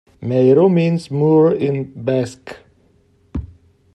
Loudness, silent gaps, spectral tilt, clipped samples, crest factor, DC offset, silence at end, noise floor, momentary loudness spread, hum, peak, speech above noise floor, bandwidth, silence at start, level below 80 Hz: -16 LUFS; none; -8.5 dB/octave; under 0.1%; 14 dB; under 0.1%; 0.5 s; -56 dBFS; 18 LU; none; -2 dBFS; 40 dB; 10.5 kHz; 0.2 s; -44 dBFS